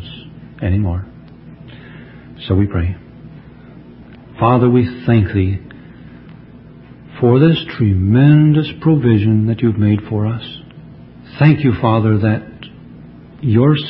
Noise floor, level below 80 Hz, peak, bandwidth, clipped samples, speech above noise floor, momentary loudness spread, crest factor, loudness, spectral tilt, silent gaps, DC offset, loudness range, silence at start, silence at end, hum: -38 dBFS; -34 dBFS; 0 dBFS; 5.4 kHz; under 0.1%; 26 dB; 23 LU; 16 dB; -14 LUFS; -12 dB/octave; none; under 0.1%; 9 LU; 0 s; 0 s; none